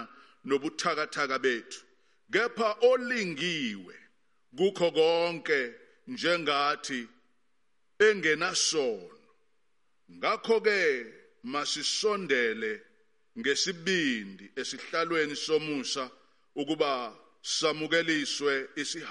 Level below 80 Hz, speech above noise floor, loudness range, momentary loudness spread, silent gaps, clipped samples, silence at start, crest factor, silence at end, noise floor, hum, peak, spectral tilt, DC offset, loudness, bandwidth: -82 dBFS; 50 dB; 3 LU; 16 LU; none; under 0.1%; 0 s; 20 dB; 0 s; -79 dBFS; none; -12 dBFS; -2.5 dB/octave; under 0.1%; -29 LUFS; 11.5 kHz